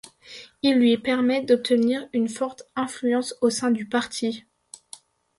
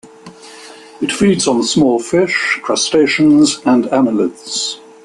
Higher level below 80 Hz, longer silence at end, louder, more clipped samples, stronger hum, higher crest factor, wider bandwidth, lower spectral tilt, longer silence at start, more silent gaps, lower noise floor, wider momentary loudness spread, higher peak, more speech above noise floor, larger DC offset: second, -66 dBFS vs -52 dBFS; first, 1 s vs 0.3 s; second, -23 LUFS vs -13 LUFS; neither; neither; about the same, 16 dB vs 12 dB; about the same, 11.5 kHz vs 11.5 kHz; about the same, -4 dB/octave vs -4 dB/octave; first, 0.3 s vs 0.05 s; neither; first, -49 dBFS vs -37 dBFS; first, 21 LU vs 9 LU; second, -8 dBFS vs -2 dBFS; about the same, 26 dB vs 24 dB; neither